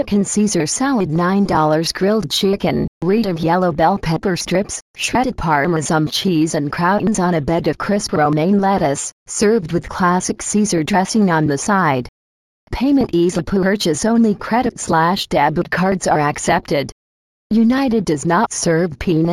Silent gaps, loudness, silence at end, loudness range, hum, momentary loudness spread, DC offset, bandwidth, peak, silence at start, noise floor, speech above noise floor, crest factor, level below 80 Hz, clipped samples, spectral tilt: 2.88-3.01 s, 4.82-4.94 s, 9.12-9.26 s, 12.09-12.67 s, 16.92-17.50 s; -17 LUFS; 0 s; 1 LU; none; 4 LU; under 0.1%; 15.5 kHz; -2 dBFS; 0 s; under -90 dBFS; over 74 dB; 14 dB; -40 dBFS; under 0.1%; -5 dB/octave